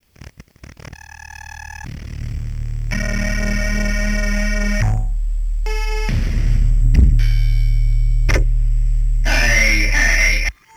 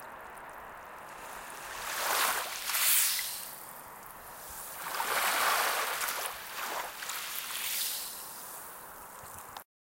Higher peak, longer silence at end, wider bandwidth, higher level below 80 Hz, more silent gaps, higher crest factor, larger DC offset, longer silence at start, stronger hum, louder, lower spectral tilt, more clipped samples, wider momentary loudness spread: first, 0 dBFS vs -14 dBFS; about the same, 0.25 s vs 0.35 s; second, 14 kHz vs 17 kHz; first, -16 dBFS vs -68 dBFS; neither; second, 16 dB vs 22 dB; neither; first, 0.2 s vs 0 s; neither; first, -18 LUFS vs -31 LUFS; first, -4.5 dB/octave vs 1.5 dB/octave; neither; about the same, 18 LU vs 19 LU